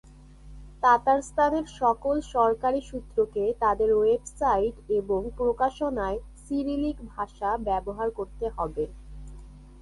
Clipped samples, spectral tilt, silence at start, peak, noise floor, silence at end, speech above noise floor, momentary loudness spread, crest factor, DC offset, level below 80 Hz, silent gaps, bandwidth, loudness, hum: under 0.1%; -6 dB/octave; 0.45 s; -10 dBFS; -48 dBFS; 0 s; 22 dB; 11 LU; 18 dB; under 0.1%; -44 dBFS; none; 11.5 kHz; -27 LUFS; none